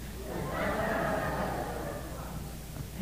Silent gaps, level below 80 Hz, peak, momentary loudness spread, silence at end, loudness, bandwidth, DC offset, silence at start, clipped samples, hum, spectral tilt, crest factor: none; -44 dBFS; -18 dBFS; 11 LU; 0 s; -35 LUFS; 15.5 kHz; 0.2%; 0 s; under 0.1%; none; -5.5 dB/octave; 16 dB